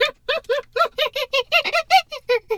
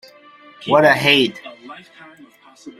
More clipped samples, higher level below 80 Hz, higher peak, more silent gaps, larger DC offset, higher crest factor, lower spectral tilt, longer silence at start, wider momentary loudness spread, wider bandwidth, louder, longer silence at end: neither; first, -56 dBFS vs -62 dBFS; about the same, -2 dBFS vs 0 dBFS; neither; neither; about the same, 18 dB vs 20 dB; second, 0 dB/octave vs -4.5 dB/octave; second, 0 s vs 0.6 s; second, 6 LU vs 24 LU; first, 18 kHz vs 15.5 kHz; second, -20 LUFS vs -14 LUFS; about the same, 0 s vs 0.1 s